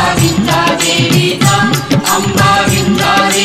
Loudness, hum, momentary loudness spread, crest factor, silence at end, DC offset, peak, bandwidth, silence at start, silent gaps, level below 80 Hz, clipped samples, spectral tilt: -10 LUFS; none; 2 LU; 10 dB; 0 s; under 0.1%; 0 dBFS; 16.5 kHz; 0 s; none; -36 dBFS; under 0.1%; -4 dB/octave